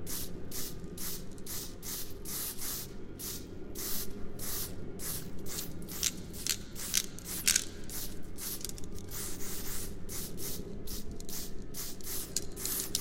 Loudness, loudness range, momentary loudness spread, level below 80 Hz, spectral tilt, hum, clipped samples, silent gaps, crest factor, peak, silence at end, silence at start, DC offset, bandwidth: -37 LUFS; 7 LU; 10 LU; -46 dBFS; -2 dB/octave; none; under 0.1%; none; 28 dB; -8 dBFS; 0 s; 0 s; under 0.1%; 17 kHz